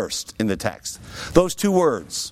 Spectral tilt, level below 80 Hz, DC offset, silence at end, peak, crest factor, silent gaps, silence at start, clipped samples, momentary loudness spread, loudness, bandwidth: -4.5 dB/octave; -42 dBFS; under 0.1%; 0 s; -2 dBFS; 20 dB; none; 0 s; under 0.1%; 14 LU; -21 LUFS; 16.5 kHz